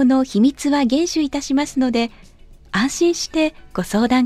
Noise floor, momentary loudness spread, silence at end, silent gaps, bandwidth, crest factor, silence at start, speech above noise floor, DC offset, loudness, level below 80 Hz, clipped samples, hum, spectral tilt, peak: -44 dBFS; 6 LU; 0 s; none; 14 kHz; 14 dB; 0 s; 26 dB; under 0.1%; -19 LUFS; -44 dBFS; under 0.1%; none; -4.5 dB/octave; -4 dBFS